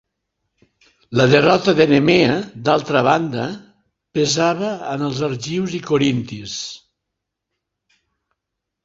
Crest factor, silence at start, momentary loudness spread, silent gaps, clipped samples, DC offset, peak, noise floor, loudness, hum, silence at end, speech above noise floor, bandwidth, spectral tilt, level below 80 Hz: 18 dB; 1.1 s; 14 LU; none; under 0.1%; under 0.1%; -2 dBFS; -80 dBFS; -18 LUFS; none; 2.05 s; 63 dB; 8 kHz; -5 dB/octave; -54 dBFS